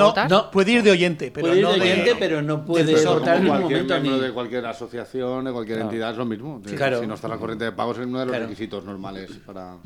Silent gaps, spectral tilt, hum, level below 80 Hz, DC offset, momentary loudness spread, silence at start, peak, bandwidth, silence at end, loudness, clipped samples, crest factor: none; -5.5 dB/octave; none; -58 dBFS; under 0.1%; 15 LU; 0 s; -2 dBFS; 13.5 kHz; 0.05 s; -21 LUFS; under 0.1%; 18 dB